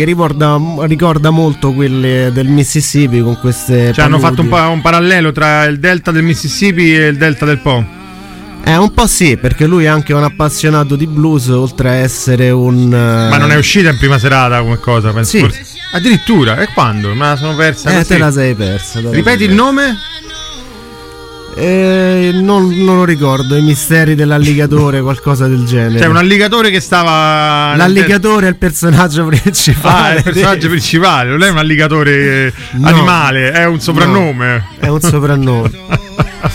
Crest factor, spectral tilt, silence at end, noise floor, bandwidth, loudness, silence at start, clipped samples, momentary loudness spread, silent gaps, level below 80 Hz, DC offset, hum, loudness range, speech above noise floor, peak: 10 dB; -5.5 dB/octave; 0 s; -29 dBFS; 16.5 kHz; -9 LUFS; 0 s; under 0.1%; 7 LU; none; -30 dBFS; under 0.1%; none; 3 LU; 20 dB; 0 dBFS